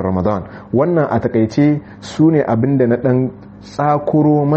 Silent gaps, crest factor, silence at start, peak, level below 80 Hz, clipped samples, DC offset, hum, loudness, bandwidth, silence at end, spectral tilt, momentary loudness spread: none; 12 dB; 0 s; -2 dBFS; -46 dBFS; under 0.1%; under 0.1%; none; -15 LUFS; 8.2 kHz; 0 s; -9 dB/octave; 9 LU